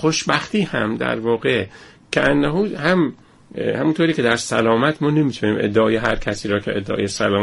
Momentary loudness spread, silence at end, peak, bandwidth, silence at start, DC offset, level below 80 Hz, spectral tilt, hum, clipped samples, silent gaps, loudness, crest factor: 6 LU; 0 s; -2 dBFS; 11.5 kHz; 0 s; under 0.1%; -42 dBFS; -5 dB/octave; none; under 0.1%; none; -19 LUFS; 16 dB